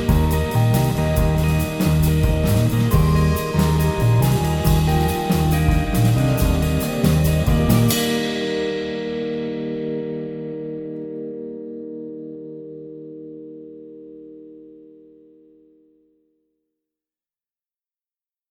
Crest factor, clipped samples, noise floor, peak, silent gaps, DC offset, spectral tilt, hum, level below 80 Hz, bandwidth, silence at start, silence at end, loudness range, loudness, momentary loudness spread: 16 dB; under 0.1%; under -90 dBFS; -4 dBFS; none; under 0.1%; -6.5 dB/octave; none; -28 dBFS; 19 kHz; 0 s; 3.7 s; 18 LU; -19 LUFS; 19 LU